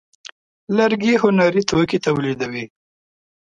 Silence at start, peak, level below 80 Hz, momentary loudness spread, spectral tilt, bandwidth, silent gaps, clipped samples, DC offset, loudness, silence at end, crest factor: 0.7 s; -2 dBFS; -54 dBFS; 11 LU; -5.5 dB/octave; 9.2 kHz; none; under 0.1%; under 0.1%; -18 LUFS; 0.75 s; 18 dB